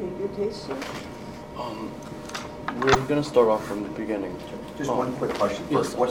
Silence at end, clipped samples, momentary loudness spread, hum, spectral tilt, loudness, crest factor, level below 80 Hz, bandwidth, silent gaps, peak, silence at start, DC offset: 0 s; under 0.1%; 15 LU; none; -5.5 dB/octave; -27 LUFS; 22 dB; -50 dBFS; 16.5 kHz; none; -4 dBFS; 0 s; under 0.1%